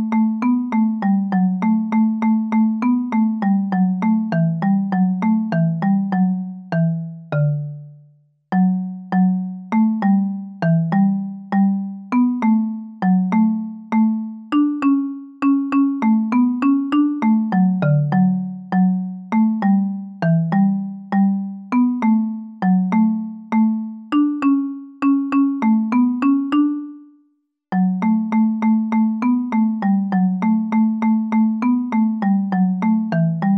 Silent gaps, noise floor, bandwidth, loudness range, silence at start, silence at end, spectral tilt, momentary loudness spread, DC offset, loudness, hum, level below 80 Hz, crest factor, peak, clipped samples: none; -64 dBFS; 5 kHz; 2 LU; 0 s; 0 s; -10 dB/octave; 6 LU; under 0.1%; -19 LUFS; none; -64 dBFS; 10 dB; -8 dBFS; under 0.1%